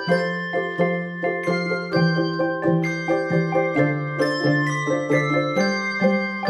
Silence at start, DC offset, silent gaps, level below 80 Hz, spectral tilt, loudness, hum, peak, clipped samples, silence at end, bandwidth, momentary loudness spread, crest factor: 0 s; under 0.1%; none; -62 dBFS; -6.5 dB/octave; -22 LUFS; none; -6 dBFS; under 0.1%; 0 s; 11.5 kHz; 4 LU; 16 dB